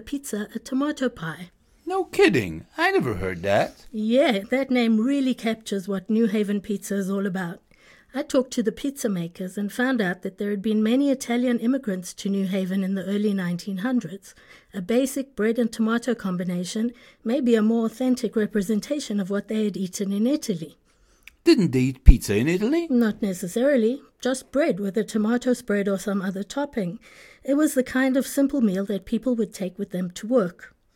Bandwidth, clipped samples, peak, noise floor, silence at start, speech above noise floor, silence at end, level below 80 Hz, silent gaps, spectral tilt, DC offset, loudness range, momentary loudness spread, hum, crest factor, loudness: 17 kHz; under 0.1%; 0 dBFS; -53 dBFS; 0 s; 30 dB; 0.25 s; -34 dBFS; none; -6 dB/octave; under 0.1%; 4 LU; 10 LU; none; 24 dB; -24 LUFS